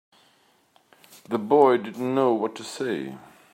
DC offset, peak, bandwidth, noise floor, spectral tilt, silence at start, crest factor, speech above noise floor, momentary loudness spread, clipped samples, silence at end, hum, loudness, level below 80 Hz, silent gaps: under 0.1%; -4 dBFS; 16 kHz; -62 dBFS; -6 dB/octave; 1.3 s; 20 dB; 39 dB; 14 LU; under 0.1%; 0.35 s; none; -23 LUFS; -76 dBFS; none